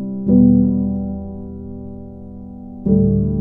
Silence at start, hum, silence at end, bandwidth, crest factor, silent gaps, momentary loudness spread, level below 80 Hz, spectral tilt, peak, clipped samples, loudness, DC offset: 0 s; none; 0 s; 1.4 kHz; 16 dB; none; 22 LU; -34 dBFS; -16 dB/octave; -2 dBFS; under 0.1%; -16 LUFS; under 0.1%